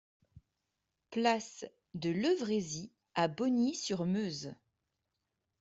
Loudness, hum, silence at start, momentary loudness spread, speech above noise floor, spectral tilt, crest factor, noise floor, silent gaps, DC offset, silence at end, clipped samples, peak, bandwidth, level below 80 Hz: -34 LUFS; none; 0.35 s; 13 LU; 52 dB; -5 dB/octave; 20 dB; -86 dBFS; none; under 0.1%; 1.05 s; under 0.1%; -16 dBFS; 8 kHz; -74 dBFS